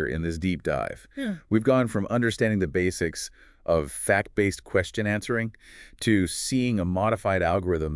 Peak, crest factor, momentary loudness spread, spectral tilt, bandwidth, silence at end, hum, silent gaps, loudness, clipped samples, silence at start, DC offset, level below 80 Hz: -8 dBFS; 18 dB; 9 LU; -5.5 dB/octave; 12 kHz; 0 s; none; none; -26 LUFS; under 0.1%; 0 s; under 0.1%; -48 dBFS